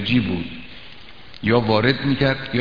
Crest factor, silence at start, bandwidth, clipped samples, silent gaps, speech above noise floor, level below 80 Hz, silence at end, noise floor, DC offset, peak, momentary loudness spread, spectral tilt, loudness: 20 dB; 0 s; 5.2 kHz; under 0.1%; none; 24 dB; -44 dBFS; 0 s; -43 dBFS; 1%; 0 dBFS; 22 LU; -8 dB/octave; -20 LUFS